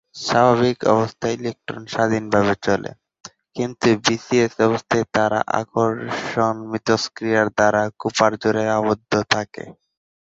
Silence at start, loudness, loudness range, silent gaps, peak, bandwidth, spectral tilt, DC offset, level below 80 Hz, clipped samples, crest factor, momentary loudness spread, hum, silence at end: 0.15 s; -20 LUFS; 2 LU; none; 0 dBFS; 8 kHz; -5 dB/octave; under 0.1%; -54 dBFS; under 0.1%; 20 dB; 10 LU; none; 0.55 s